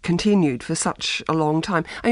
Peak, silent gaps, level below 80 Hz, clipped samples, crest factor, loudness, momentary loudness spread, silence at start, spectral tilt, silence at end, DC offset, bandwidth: -4 dBFS; none; -50 dBFS; under 0.1%; 16 dB; -21 LUFS; 5 LU; 0.05 s; -5 dB/octave; 0 s; under 0.1%; 11.5 kHz